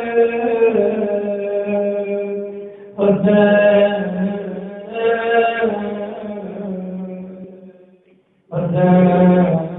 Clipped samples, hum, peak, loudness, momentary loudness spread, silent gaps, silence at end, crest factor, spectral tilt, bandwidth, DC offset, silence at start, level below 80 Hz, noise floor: under 0.1%; none; 0 dBFS; -17 LUFS; 16 LU; none; 0 s; 16 dB; -12 dB/octave; 3.9 kHz; under 0.1%; 0 s; -54 dBFS; -55 dBFS